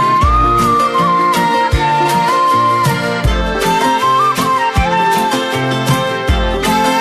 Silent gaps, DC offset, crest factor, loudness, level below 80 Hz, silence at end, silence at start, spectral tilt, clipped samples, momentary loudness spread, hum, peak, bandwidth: none; under 0.1%; 12 dB; -13 LUFS; -24 dBFS; 0 s; 0 s; -5 dB/octave; under 0.1%; 4 LU; none; -2 dBFS; 14 kHz